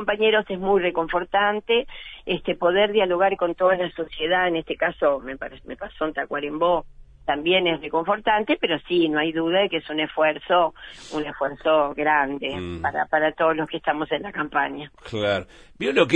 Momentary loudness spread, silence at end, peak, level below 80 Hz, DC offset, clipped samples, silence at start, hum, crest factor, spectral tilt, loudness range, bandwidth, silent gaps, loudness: 9 LU; 0 s; -4 dBFS; -50 dBFS; under 0.1%; under 0.1%; 0 s; none; 20 dB; -5.5 dB/octave; 3 LU; 9.4 kHz; none; -23 LUFS